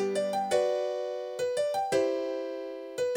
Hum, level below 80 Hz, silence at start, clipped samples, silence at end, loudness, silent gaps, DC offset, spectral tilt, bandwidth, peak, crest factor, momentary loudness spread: none; -74 dBFS; 0 s; under 0.1%; 0 s; -30 LUFS; none; under 0.1%; -4 dB/octave; 18.5 kHz; -14 dBFS; 16 dB; 8 LU